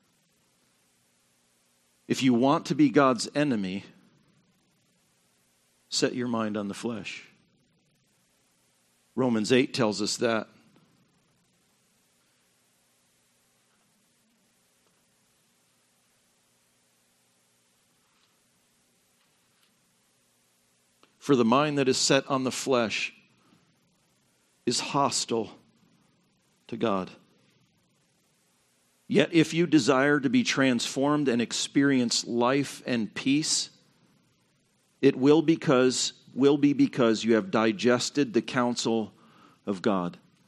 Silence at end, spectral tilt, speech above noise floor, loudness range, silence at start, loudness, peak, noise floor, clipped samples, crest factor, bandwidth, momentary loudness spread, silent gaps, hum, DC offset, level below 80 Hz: 0.3 s; -4.5 dB/octave; 44 dB; 9 LU; 2.1 s; -25 LUFS; -6 dBFS; -69 dBFS; under 0.1%; 24 dB; 12.5 kHz; 12 LU; none; 60 Hz at -55 dBFS; under 0.1%; -76 dBFS